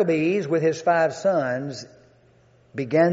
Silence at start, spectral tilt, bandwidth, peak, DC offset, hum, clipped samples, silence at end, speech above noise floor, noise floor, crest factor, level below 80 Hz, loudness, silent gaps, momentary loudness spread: 0 s; -5.5 dB/octave; 8 kHz; -6 dBFS; under 0.1%; none; under 0.1%; 0 s; 35 dB; -57 dBFS; 16 dB; -68 dBFS; -22 LUFS; none; 13 LU